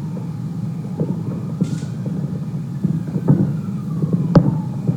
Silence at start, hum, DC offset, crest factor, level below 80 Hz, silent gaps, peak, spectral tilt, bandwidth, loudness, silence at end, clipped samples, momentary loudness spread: 0 s; none; under 0.1%; 20 dB; -42 dBFS; none; 0 dBFS; -9.5 dB/octave; 9.4 kHz; -21 LUFS; 0 s; under 0.1%; 11 LU